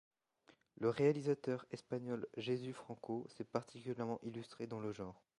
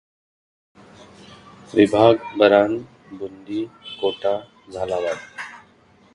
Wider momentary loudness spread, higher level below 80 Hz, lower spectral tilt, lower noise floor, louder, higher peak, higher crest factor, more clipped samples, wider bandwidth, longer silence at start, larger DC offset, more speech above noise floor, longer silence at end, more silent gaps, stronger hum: second, 13 LU vs 20 LU; second, -78 dBFS vs -58 dBFS; about the same, -7 dB/octave vs -6 dB/octave; first, -72 dBFS vs -54 dBFS; second, -42 LUFS vs -20 LUFS; second, -22 dBFS vs 0 dBFS; about the same, 20 dB vs 22 dB; neither; about the same, 11.5 kHz vs 11 kHz; second, 0.8 s vs 1.75 s; neither; second, 31 dB vs 35 dB; second, 0.25 s vs 0.6 s; neither; neither